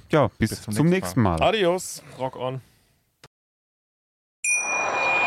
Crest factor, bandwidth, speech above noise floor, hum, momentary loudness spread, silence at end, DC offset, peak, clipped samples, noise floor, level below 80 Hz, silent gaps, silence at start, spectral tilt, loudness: 18 dB; 16.5 kHz; 41 dB; none; 11 LU; 0 s; under 0.1%; -8 dBFS; under 0.1%; -64 dBFS; -48 dBFS; 3.27-4.43 s; 0.1 s; -4.5 dB/octave; -23 LUFS